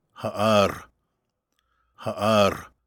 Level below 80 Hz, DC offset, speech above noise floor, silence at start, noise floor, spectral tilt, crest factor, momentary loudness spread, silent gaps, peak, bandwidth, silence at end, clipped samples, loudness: -56 dBFS; under 0.1%; 55 dB; 0.2 s; -77 dBFS; -5 dB/octave; 20 dB; 15 LU; none; -6 dBFS; 19 kHz; 0.2 s; under 0.1%; -22 LUFS